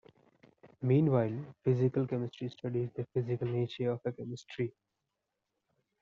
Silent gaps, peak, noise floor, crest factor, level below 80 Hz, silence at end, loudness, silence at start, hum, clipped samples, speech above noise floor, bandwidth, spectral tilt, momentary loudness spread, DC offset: none; -16 dBFS; -86 dBFS; 18 dB; -72 dBFS; 1.3 s; -34 LUFS; 0.65 s; none; under 0.1%; 53 dB; 7.4 kHz; -8.5 dB/octave; 11 LU; under 0.1%